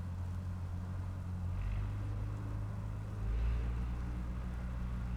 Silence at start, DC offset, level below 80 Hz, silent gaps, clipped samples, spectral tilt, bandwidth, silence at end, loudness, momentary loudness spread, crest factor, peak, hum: 0 s; under 0.1%; -40 dBFS; none; under 0.1%; -8 dB/octave; 9.2 kHz; 0 s; -41 LUFS; 4 LU; 12 dB; -26 dBFS; none